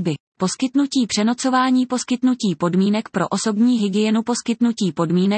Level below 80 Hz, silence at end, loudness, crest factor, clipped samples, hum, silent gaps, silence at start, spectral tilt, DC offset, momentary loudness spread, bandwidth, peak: -66 dBFS; 0 s; -19 LUFS; 12 dB; under 0.1%; none; 0.20-0.32 s; 0 s; -5 dB/octave; under 0.1%; 5 LU; 8.8 kHz; -6 dBFS